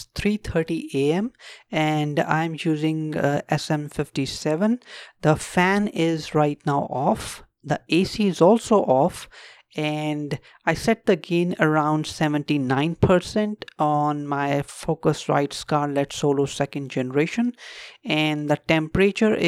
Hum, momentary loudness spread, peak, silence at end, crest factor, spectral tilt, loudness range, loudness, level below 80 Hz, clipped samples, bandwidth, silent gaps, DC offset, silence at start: none; 9 LU; -4 dBFS; 0 s; 18 dB; -6 dB/octave; 2 LU; -23 LUFS; -50 dBFS; under 0.1%; 14.5 kHz; none; under 0.1%; 0 s